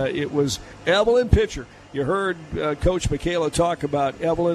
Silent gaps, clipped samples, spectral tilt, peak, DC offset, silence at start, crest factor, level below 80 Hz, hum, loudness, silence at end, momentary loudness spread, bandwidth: none; under 0.1%; -5.5 dB/octave; -2 dBFS; under 0.1%; 0 s; 20 dB; -32 dBFS; none; -22 LUFS; 0 s; 9 LU; 14 kHz